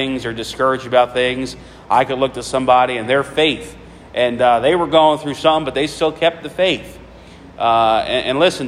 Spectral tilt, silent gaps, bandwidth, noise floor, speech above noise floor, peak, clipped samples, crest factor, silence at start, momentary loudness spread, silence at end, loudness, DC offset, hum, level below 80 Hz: -4.5 dB/octave; none; 14.5 kHz; -39 dBFS; 23 dB; 0 dBFS; under 0.1%; 16 dB; 0 s; 10 LU; 0 s; -16 LUFS; under 0.1%; none; -46 dBFS